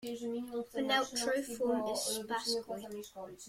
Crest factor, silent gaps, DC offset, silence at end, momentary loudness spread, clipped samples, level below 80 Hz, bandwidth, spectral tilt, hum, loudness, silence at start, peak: 18 dB; none; under 0.1%; 0 s; 11 LU; under 0.1%; -72 dBFS; 16.5 kHz; -2 dB/octave; none; -35 LUFS; 0 s; -18 dBFS